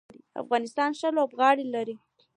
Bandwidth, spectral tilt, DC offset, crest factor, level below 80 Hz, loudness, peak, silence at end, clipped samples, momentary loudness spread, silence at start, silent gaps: 10.5 kHz; -4 dB/octave; under 0.1%; 18 dB; -82 dBFS; -26 LUFS; -8 dBFS; 0.4 s; under 0.1%; 17 LU; 0.35 s; none